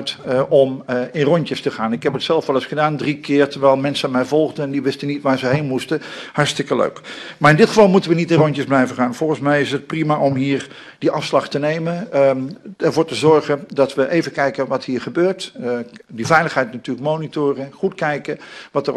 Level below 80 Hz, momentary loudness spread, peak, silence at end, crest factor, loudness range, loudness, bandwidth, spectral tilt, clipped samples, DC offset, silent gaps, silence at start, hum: -60 dBFS; 10 LU; 0 dBFS; 0 s; 18 dB; 4 LU; -18 LUFS; 12.5 kHz; -6 dB/octave; under 0.1%; under 0.1%; none; 0 s; none